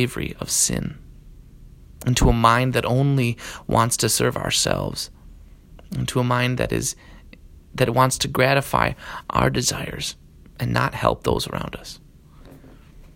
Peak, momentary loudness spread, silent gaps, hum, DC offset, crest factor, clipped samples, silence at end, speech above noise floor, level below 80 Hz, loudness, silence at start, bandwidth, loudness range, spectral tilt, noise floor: 0 dBFS; 15 LU; none; none; under 0.1%; 22 dB; under 0.1%; 0.1 s; 25 dB; -36 dBFS; -21 LUFS; 0 s; 16.5 kHz; 5 LU; -4 dB/octave; -46 dBFS